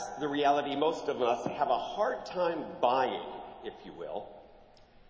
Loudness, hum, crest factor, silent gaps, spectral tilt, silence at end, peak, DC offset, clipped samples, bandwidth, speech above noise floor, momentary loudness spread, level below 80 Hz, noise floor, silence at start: -31 LUFS; none; 20 dB; none; -4.5 dB/octave; 0.45 s; -12 dBFS; under 0.1%; under 0.1%; 8 kHz; 26 dB; 16 LU; -66 dBFS; -57 dBFS; 0 s